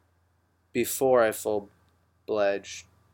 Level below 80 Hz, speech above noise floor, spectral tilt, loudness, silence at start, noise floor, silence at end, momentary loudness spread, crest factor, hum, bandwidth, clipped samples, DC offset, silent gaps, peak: -68 dBFS; 43 dB; -3.5 dB/octave; -27 LUFS; 0.75 s; -69 dBFS; 0.3 s; 19 LU; 18 dB; none; 17 kHz; under 0.1%; under 0.1%; none; -10 dBFS